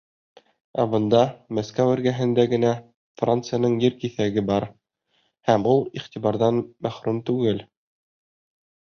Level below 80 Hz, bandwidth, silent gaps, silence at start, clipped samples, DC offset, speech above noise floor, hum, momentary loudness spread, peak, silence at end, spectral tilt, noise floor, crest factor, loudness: -58 dBFS; 6.8 kHz; 2.94-3.15 s; 0.75 s; under 0.1%; under 0.1%; 48 dB; none; 10 LU; -4 dBFS; 1.2 s; -7 dB/octave; -69 dBFS; 20 dB; -23 LUFS